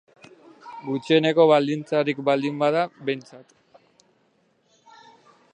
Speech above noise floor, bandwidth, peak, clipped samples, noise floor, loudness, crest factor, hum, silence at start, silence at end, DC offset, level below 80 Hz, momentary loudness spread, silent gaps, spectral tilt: 44 dB; 9.2 kHz; -4 dBFS; under 0.1%; -65 dBFS; -22 LUFS; 20 dB; none; 0.65 s; 2.15 s; under 0.1%; -78 dBFS; 14 LU; none; -6.5 dB/octave